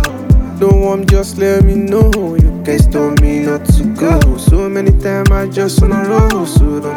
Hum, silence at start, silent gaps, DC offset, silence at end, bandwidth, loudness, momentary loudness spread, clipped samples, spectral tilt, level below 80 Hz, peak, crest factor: none; 0 s; none; under 0.1%; 0 s; 17 kHz; -12 LUFS; 2 LU; under 0.1%; -7 dB/octave; -14 dBFS; 0 dBFS; 10 dB